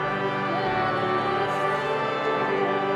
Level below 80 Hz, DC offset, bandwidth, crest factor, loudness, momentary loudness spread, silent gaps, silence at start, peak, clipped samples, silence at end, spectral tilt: -58 dBFS; under 0.1%; 11.5 kHz; 12 dB; -25 LUFS; 2 LU; none; 0 s; -12 dBFS; under 0.1%; 0 s; -6 dB/octave